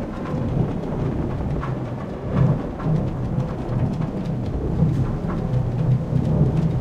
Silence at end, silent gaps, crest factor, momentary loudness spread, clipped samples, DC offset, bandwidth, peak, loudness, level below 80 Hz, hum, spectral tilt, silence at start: 0 s; none; 16 dB; 6 LU; under 0.1%; under 0.1%; 7.2 kHz; -6 dBFS; -23 LUFS; -32 dBFS; none; -9.5 dB/octave; 0 s